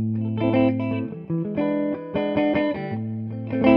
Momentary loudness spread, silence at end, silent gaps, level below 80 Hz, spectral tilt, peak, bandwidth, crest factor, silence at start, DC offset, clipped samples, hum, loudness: 8 LU; 0 s; none; -54 dBFS; -10.5 dB/octave; -2 dBFS; 5.2 kHz; 22 dB; 0 s; under 0.1%; under 0.1%; none; -24 LUFS